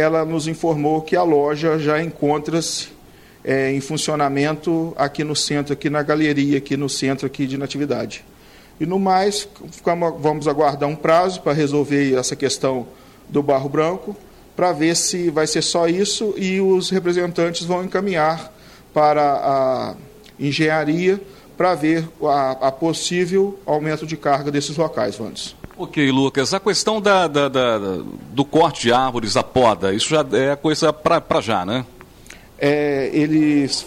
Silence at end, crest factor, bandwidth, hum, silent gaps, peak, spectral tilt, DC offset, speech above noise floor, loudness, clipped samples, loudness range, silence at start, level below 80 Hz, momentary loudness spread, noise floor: 0 s; 16 dB; 15.5 kHz; none; none; -4 dBFS; -4.5 dB/octave; under 0.1%; 27 dB; -19 LUFS; under 0.1%; 3 LU; 0 s; -52 dBFS; 8 LU; -46 dBFS